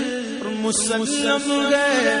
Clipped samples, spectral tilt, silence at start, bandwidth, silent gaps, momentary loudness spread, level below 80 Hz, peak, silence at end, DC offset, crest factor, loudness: under 0.1%; -2 dB/octave; 0 s; 11 kHz; none; 8 LU; -60 dBFS; -6 dBFS; 0 s; under 0.1%; 16 dB; -20 LUFS